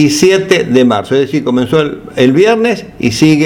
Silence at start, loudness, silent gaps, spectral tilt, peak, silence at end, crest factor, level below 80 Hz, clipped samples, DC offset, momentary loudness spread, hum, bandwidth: 0 s; -11 LUFS; none; -5 dB/octave; 0 dBFS; 0 s; 10 dB; -44 dBFS; 0.2%; under 0.1%; 6 LU; none; 17 kHz